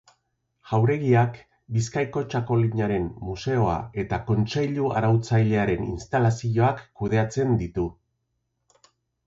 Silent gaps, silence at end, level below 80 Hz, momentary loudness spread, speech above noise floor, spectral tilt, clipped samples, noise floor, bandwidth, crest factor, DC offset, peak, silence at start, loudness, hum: none; 1.35 s; -46 dBFS; 8 LU; 53 dB; -7.5 dB/octave; under 0.1%; -76 dBFS; 7.8 kHz; 16 dB; under 0.1%; -8 dBFS; 0.65 s; -24 LUFS; none